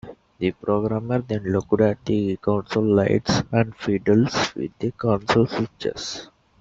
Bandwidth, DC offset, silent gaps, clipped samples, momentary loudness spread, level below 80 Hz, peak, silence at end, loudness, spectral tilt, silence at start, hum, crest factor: 7.8 kHz; under 0.1%; none; under 0.1%; 9 LU; -52 dBFS; -4 dBFS; 0.35 s; -22 LUFS; -6 dB/octave; 0.05 s; none; 18 dB